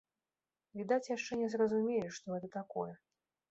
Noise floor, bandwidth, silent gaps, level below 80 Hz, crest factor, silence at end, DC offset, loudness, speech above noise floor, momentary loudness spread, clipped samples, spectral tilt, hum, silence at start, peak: under -90 dBFS; 8 kHz; none; -78 dBFS; 18 dB; 0.55 s; under 0.1%; -37 LUFS; over 54 dB; 11 LU; under 0.1%; -5 dB/octave; none; 0.75 s; -20 dBFS